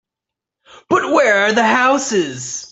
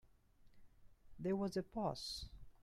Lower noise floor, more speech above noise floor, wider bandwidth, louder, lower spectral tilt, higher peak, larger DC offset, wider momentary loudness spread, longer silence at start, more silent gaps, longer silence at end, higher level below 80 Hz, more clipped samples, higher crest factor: first, -84 dBFS vs -67 dBFS; first, 69 dB vs 25 dB; second, 8.4 kHz vs 14.5 kHz; first, -15 LUFS vs -43 LUFS; second, -3 dB/octave vs -5.5 dB/octave; first, -2 dBFS vs -28 dBFS; neither; about the same, 8 LU vs 8 LU; first, 0.9 s vs 0.05 s; neither; about the same, 0.05 s vs 0 s; about the same, -60 dBFS vs -62 dBFS; neither; about the same, 16 dB vs 18 dB